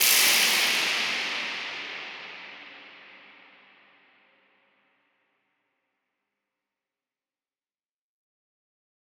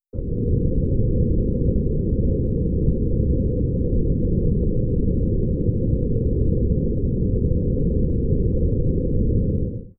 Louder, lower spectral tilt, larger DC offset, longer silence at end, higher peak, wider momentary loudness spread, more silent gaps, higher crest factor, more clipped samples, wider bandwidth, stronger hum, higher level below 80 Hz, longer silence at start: about the same, -23 LUFS vs -22 LUFS; second, 2 dB/octave vs -20 dB/octave; neither; first, 5.85 s vs 0.1 s; about the same, -6 dBFS vs -6 dBFS; first, 25 LU vs 1 LU; neither; first, 24 dB vs 14 dB; neither; first, over 20 kHz vs 1 kHz; neither; second, -86 dBFS vs -24 dBFS; second, 0 s vs 0.15 s